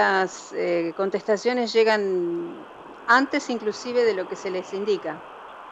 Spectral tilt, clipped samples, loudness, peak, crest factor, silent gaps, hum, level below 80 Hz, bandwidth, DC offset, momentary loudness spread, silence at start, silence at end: -4 dB/octave; under 0.1%; -24 LUFS; -6 dBFS; 18 dB; none; none; -70 dBFS; 8.6 kHz; under 0.1%; 16 LU; 0 s; 0 s